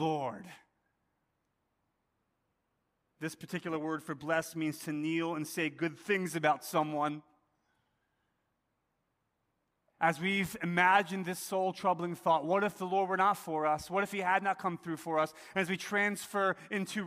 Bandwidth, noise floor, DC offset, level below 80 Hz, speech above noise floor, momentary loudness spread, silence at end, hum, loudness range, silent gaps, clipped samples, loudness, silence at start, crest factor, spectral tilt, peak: 15.5 kHz; -81 dBFS; under 0.1%; -74 dBFS; 48 dB; 9 LU; 0 s; none; 12 LU; none; under 0.1%; -33 LUFS; 0 s; 22 dB; -5 dB/octave; -12 dBFS